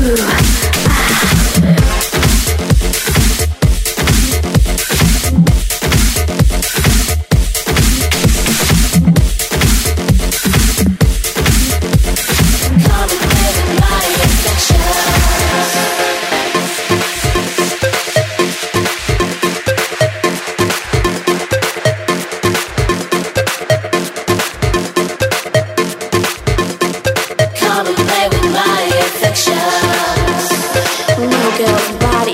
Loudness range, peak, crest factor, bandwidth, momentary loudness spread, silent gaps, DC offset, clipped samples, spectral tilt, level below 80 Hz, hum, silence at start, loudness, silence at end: 4 LU; 0 dBFS; 12 dB; 16.5 kHz; 5 LU; none; under 0.1%; under 0.1%; -4 dB/octave; -18 dBFS; none; 0 s; -13 LUFS; 0 s